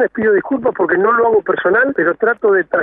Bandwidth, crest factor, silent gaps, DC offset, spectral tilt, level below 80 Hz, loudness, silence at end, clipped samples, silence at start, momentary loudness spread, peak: 3.8 kHz; 12 dB; none; under 0.1%; -9.5 dB/octave; -54 dBFS; -14 LUFS; 0 s; under 0.1%; 0 s; 3 LU; -2 dBFS